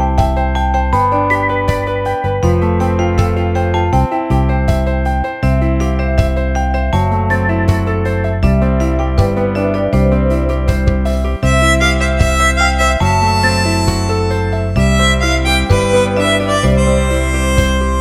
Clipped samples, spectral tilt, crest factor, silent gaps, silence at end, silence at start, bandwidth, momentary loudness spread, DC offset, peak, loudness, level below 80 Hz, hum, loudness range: under 0.1%; -5.5 dB/octave; 12 dB; none; 0 s; 0 s; 13.5 kHz; 4 LU; under 0.1%; 0 dBFS; -14 LUFS; -18 dBFS; none; 2 LU